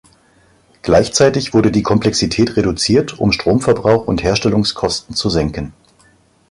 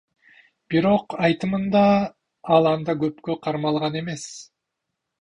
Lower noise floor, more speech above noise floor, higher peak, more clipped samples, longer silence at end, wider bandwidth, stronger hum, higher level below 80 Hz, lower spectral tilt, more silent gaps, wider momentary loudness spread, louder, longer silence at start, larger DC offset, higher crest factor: second, -52 dBFS vs -81 dBFS; second, 38 dB vs 60 dB; about the same, -2 dBFS vs -4 dBFS; neither; about the same, 0.8 s vs 0.75 s; about the same, 11.5 kHz vs 10.5 kHz; neither; first, -36 dBFS vs -56 dBFS; second, -5 dB/octave vs -6.5 dB/octave; neither; second, 5 LU vs 13 LU; first, -15 LUFS vs -22 LUFS; first, 0.85 s vs 0.7 s; neither; second, 14 dB vs 20 dB